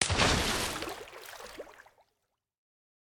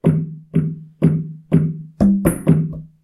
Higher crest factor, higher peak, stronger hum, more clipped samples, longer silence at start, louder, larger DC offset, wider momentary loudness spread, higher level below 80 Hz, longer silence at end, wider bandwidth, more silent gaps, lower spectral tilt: first, 28 dB vs 18 dB; second, -6 dBFS vs 0 dBFS; neither; neither; about the same, 0 s vs 0.05 s; second, -29 LUFS vs -19 LUFS; neither; first, 21 LU vs 8 LU; second, -46 dBFS vs -40 dBFS; first, 1.2 s vs 0.15 s; first, over 20 kHz vs 13.5 kHz; neither; second, -2.5 dB/octave vs -9 dB/octave